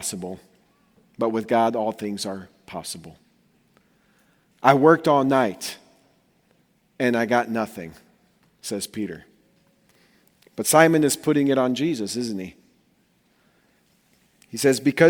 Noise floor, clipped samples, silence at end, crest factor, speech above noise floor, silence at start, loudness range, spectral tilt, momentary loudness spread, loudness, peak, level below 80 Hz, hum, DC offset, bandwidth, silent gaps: -64 dBFS; under 0.1%; 0 s; 24 dB; 43 dB; 0 s; 7 LU; -4.5 dB/octave; 21 LU; -22 LUFS; 0 dBFS; -66 dBFS; none; under 0.1%; over 20 kHz; none